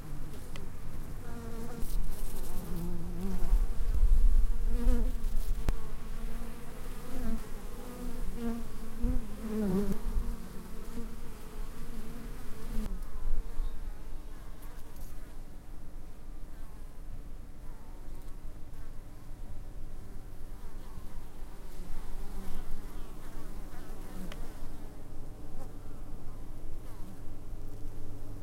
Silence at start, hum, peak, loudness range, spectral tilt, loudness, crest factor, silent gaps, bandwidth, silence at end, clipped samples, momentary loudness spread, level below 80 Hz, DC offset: 0 s; none; -12 dBFS; 15 LU; -6.5 dB/octave; -41 LUFS; 18 dB; none; 14 kHz; 0 s; under 0.1%; 15 LU; -34 dBFS; under 0.1%